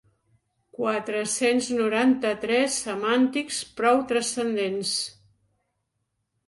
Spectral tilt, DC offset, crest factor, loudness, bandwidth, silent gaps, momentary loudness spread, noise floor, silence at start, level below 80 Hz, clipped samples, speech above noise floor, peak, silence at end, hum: -2.5 dB/octave; under 0.1%; 18 dB; -24 LUFS; 11.5 kHz; none; 6 LU; -78 dBFS; 0.75 s; -66 dBFS; under 0.1%; 54 dB; -8 dBFS; 1.35 s; none